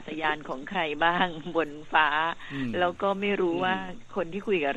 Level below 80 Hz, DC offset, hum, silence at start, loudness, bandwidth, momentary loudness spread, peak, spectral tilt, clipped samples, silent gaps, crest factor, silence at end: -54 dBFS; under 0.1%; none; 0 s; -28 LUFS; 8.8 kHz; 9 LU; -8 dBFS; -6 dB/octave; under 0.1%; none; 20 dB; 0 s